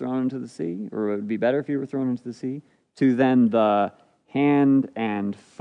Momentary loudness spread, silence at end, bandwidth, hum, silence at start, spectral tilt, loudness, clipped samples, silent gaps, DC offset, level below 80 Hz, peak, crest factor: 12 LU; 0.25 s; 9 kHz; none; 0 s; -8 dB/octave; -23 LUFS; under 0.1%; none; under 0.1%; -76 dBFS; -8 dBFS; 16 dB